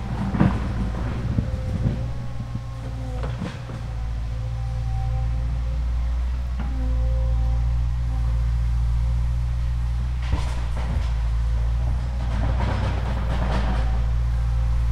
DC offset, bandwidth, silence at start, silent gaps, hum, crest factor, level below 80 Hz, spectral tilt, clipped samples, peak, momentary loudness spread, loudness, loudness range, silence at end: under 0.1%; 7.4 kHz; 0 s; none; none; 18 dB; -24 dBFS; -7.5 dB/octave; under 0.1%; -4 dBFS; 6 LU; -26 LUFS; 4 LU; 0 s